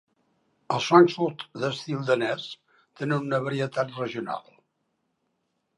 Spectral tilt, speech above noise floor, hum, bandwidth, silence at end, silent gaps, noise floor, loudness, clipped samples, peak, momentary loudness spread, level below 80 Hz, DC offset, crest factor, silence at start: -6 dB/octave; 51 dB; none; 11 kHz; 1.4 s; none; -76 dBFS; -25 LUFS; under 0.1%; -2 dBFS; 16 LU; -76 dBFS; under 0.1%; 24 dB; 0.7 s